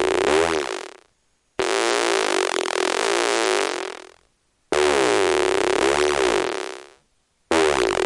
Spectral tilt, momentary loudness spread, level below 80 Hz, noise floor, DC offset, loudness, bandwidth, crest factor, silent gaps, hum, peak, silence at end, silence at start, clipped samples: -2 dB/octave; 13 LU; -52 dBFS; -66 dBFS; under 0.1%; -20 LUFS; 11.5 kHz; 20 dB; none; none; -2 dBFS; 0 s; 0 s; under 0.1%